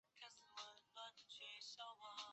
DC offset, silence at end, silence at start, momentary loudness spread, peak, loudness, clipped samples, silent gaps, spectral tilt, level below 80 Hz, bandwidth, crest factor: under 0.1%; 0 s; 0.15 s; 5 LU; -40 dBFS; -56 LUFS; under 0.1%; none; 1 dB/octave; under -90 dBFS; 8.2 kHz; 18 dB